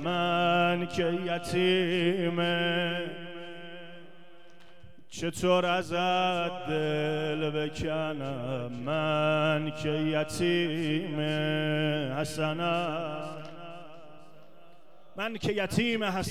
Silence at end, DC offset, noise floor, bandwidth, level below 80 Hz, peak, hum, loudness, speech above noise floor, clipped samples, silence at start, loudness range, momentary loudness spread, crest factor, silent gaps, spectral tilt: 0 s; 0.5%; -58 dBFS; 15 kHz; -60 dBFS; -12 dBFS; none; -29 LUFS; 29 dB; under 0.1%; 0 s; 5 LU; 16 LU; 18 dB; none; -5.5 dB/octave